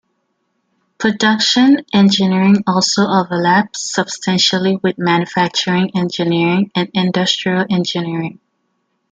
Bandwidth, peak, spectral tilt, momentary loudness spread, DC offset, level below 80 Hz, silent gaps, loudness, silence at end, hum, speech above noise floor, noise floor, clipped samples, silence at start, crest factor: 9 kHz; 0 dBFS; -4.5 dB/octave; 7 LU; under 0.1%; -60 dBFS; none; -14 LUFS; 0.8 s; none; 53 dB; -67 dBFS; under 0.1%; 1 s; 14 dB